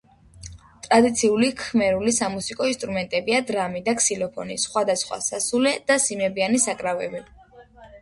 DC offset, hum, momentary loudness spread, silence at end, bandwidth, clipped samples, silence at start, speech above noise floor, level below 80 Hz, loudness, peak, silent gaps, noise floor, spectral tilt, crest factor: under 0.1%; none; 9 LU; 0.05 s; 11.5 kHz; under 0.1%; 0.35 s; 26 dB; -54 dBFS; -22 LUFS; -4 dBFS; none; -48 dBFS; -3 dB/octave; 20 dB